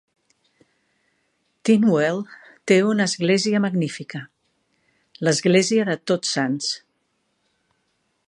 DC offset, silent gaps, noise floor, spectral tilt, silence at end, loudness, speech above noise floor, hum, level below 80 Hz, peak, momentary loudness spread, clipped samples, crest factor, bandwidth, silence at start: under 0.1%; none; -71 dBFS; -4.5 dB/octave; 1.5 s; -20 LUFS; 51 dB; none; -72 dBFS; -2 dBFS; 15 LU; under 0.1%; 20 dB; 11.5 kHz; 1.65 s